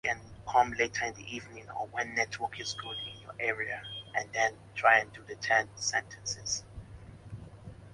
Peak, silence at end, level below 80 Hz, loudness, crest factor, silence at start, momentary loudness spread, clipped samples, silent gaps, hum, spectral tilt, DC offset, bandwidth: -10 dBFS; 0 s; -58 dBFS; -31 LUFS; 24 dB; 0.05 s; 21 LU; under 0.1%; none; none; -2 dB/octave; under 0.1%; 11.5 kHz